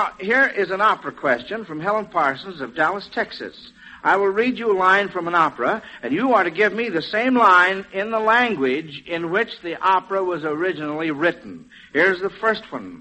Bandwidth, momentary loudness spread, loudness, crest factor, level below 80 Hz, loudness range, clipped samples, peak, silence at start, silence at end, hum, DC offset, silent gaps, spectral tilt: 8.4 kHz; 11 LU; -20 LUFS; 18 dB; -62 dBFS; 5 LU; under 0.1%; -4 dBFS; 0 s; 0 s; none; under 0.1%; none; -5.5 dB/octave